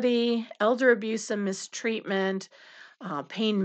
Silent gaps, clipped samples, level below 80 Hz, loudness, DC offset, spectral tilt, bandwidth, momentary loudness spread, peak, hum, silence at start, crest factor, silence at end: none; under 0.1%; under -90 dBFS; -27 LUFS; under 0.1%; -4.5 dB/octave; 9 kHz; 13 LU; -8 dBFS; none; 0 s; 20 dB; 0 s